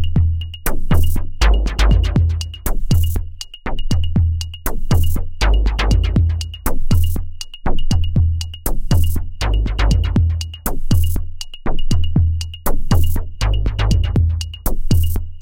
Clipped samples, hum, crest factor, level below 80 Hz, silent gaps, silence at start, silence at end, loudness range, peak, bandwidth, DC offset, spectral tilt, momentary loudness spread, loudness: under 0.1%; none; 12 dB; -18 dBFS; none; 0 s; 0 s; 2 LU; -2 dBFS; 17 kHz; 2%; -5.5 dB/octave; 9 LU; -19 LUFS